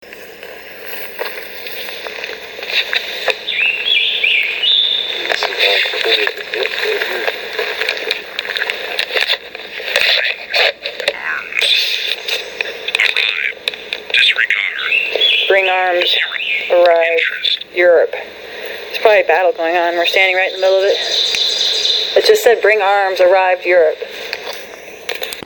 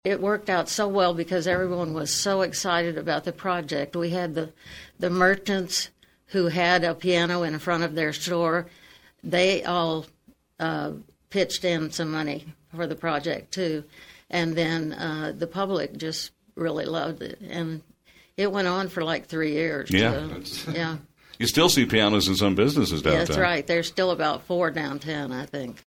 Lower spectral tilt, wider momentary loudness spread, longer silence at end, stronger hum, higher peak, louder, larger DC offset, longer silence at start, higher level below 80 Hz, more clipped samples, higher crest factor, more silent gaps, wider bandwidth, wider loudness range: second, -0.5 dB/octave vs -4 dB/octave; about the same, 13 LU vs 12 LU; about the same, 0.05 s vs 0.1 s; neither; first, 0 dBFS vs -4 dBFS; first, -14 LUFS vs -25 LUFS; neither; about the same, 0 s vs 0.05 s; second, -60 dBFS vs -52 dBFS; neither; second, 16 dB vs 22 dB; neither; about the same, over 20 kHz vs 19 kHz; about the same, 5 LU vs 7 LU